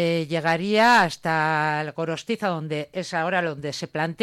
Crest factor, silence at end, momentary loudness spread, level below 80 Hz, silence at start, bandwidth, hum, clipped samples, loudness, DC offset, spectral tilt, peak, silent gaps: 14 dB; 0 s; 12 LU; -64 dBFS; 0 s; 16 kHz; none; under 0.1%; -23 LUFS; under 0.1%; -5 dB/octave; -8 dBFS; none